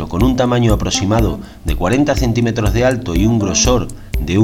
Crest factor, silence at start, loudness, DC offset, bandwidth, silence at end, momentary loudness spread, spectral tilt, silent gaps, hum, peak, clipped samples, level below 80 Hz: 14 dB; 0 s; -15 LUFS; under 0.1%; 16.5 kHz; 0 s; 7 LU; -5 dB/octave; none; none; 0 dBFS; under 0.1%; -22 dBFS